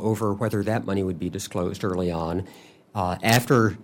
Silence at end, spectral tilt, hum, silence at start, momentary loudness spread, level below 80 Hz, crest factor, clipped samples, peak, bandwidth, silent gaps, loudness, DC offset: 0 s; -5.5 dB/octave; none; 0 s; 10 LU; -52 dBFS; 20 dB; under 0.1%; -6 dBFS; 16.5 kHz; none; -25 LUFS; under 0.1%